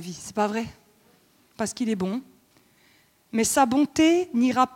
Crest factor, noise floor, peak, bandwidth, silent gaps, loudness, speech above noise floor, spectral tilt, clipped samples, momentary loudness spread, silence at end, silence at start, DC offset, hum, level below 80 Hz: 18 dB; -61 dBFS; -6 dBFS; 16.5 kHz; none; -24 LUFS; 37 dB; -4 dB/octave; under 0.1%; 12 LU; 0 s; 0 s; under 0.1%; none; -60 dBFS